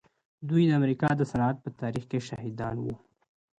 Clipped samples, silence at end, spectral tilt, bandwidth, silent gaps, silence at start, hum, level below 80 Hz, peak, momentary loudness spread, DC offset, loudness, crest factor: under 0.1%; 0.6 s; -8 dB/octave; 9.2 kHz; none; 0.4 s; none; -58 dBFS; -12 dBFS; 13 LU; under 0.1%; -29 LUFS; 16 dB